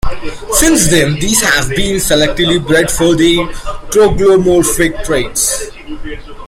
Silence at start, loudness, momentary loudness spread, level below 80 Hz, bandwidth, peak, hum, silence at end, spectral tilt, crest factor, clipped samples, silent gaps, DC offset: 0.05 s; -11 LUFS; 17 LU; -24 dBFS; 17 kHz; 0 dBFS; none; 0 s; -3.5 dB/octave; 12 dB; under 0.1%; none; under 0.1%